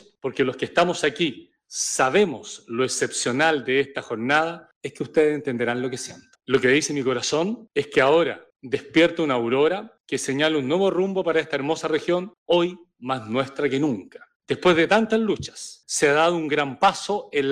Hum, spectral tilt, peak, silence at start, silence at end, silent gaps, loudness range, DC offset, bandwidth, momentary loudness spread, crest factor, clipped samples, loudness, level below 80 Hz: none; -4 dB/octave; -8 dBFS; 0.25 s; 0 s; 4.76-4.81 s, 10.00-10.04 s, 12.38-12.46 s, 14.35-14.40 s; 2 LU; under 0.1%; 15.5 kHz; 11 LU; 16 dB; under 0.1%; -22 LUFS; -64 dBFS